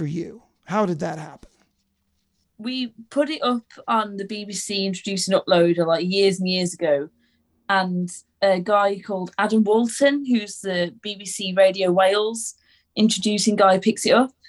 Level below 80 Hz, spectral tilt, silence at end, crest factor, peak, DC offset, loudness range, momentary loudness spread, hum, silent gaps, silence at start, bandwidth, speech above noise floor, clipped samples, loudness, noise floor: -66 dBFS; -4.5 dB/octave; 0.2 s; 18 dB; -4 dBFS; under 0.1%; 7 LU; 12 LU; none; none; 0 s; 12.5 kHz; 50 dB; under 0.1%; -21 LUFS; -71 dBFS